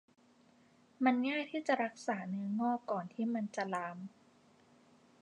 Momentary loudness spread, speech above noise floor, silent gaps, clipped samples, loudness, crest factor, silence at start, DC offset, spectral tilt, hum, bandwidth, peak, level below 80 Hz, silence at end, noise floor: 8 LU; 31 dB; none; under 0.1%; -36 LUFS; 20 dB; 1 s; under 0.1%; -6 dB/octave; none; 10.5 kHz; -18 dBFS; -90 dBFS; 1.15 s; -67 dBFS